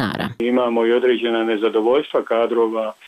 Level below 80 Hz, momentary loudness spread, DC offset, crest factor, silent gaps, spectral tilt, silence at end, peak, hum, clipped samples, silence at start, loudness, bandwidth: -60 dBFS; 4 LU; under 0.1%; 10 dB; none; -6.5 dB/octave; 0.15 s; -8 dBFS; none; under 0.1%; 0 s; -19 LUFS; 13 kHz